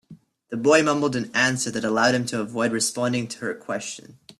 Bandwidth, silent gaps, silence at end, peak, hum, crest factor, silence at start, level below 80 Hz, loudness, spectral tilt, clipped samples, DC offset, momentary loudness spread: 13.5 kHz; none; 0.05 s; -4 dBFS; none; 20 dB; 0.1 s; -64 dBFS; -23 LUFS; -3.5 dB/octave; under 0.1%; under 0.1%; 12 LU